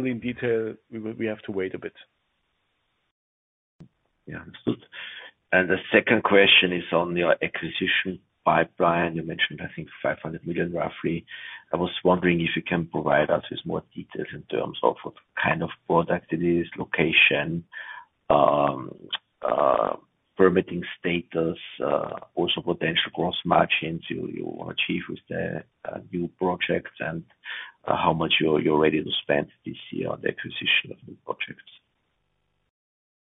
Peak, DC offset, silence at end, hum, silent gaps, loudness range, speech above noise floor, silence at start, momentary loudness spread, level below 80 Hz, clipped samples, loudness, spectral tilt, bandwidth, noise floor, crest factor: -2 dBFS; under 0.1%; 1.75 s; none; 3.11-3.79 s; 9 LU; 49 dB; 0 s; 15 LU; -58 dBFS; under 0.1%; -24 LUFS; -8.5 dB/octave; 4 kHz; -74 dBFS; 24 dB